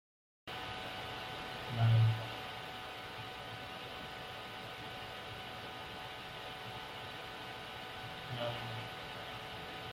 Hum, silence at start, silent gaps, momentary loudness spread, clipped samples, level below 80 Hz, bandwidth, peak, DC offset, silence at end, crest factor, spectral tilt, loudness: none; 0.45 s; none; 11 LU; under 0.1%; -64 dBFS; 16 kHz; -20 dBFS; under 0.1%; 0 s; 20 dB; -5.5 dB/octave; -41 LUFS